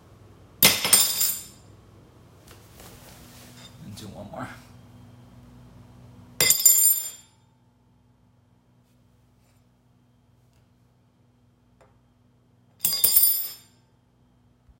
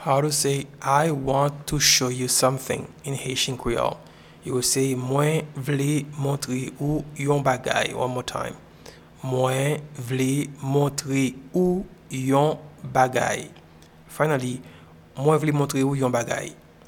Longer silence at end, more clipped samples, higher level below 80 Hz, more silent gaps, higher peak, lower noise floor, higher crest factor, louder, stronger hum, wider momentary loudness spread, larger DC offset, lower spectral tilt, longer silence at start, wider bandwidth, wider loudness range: first, 1.25 s vs 0.3 s; neither; second, -60 dBFS vs -50 dBFS; neither; first, 0 dBFS vs -4 dBFS; first, -62 dBFS vs -49 dBFS; first, 28 dB vs 20 dB; first, -18 LUFS vs -24 LUFS; first, 60 Hz at -70 dBFS vs none; first, 26 LU vs 10 LU; neither; second, 0 dB/octave vs -4.5 dB/octave; first, 0.6 s vs 0 s; about the same, 16.5 kHz vs 18 kHz; first, 21 LU vs 4 LU